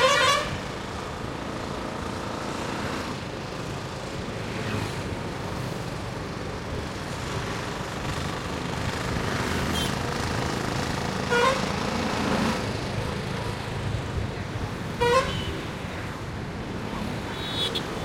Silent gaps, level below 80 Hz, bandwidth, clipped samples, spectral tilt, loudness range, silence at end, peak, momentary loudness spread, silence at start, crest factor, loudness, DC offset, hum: none; -42 dBFS; 16.5 kHz; under 0.1%; -4.5 dB/octave; 6 LU; 0 s; -8 dBFS; 10 LU; 0 s; 20 dB; -29 LUFS; under 0.1%; none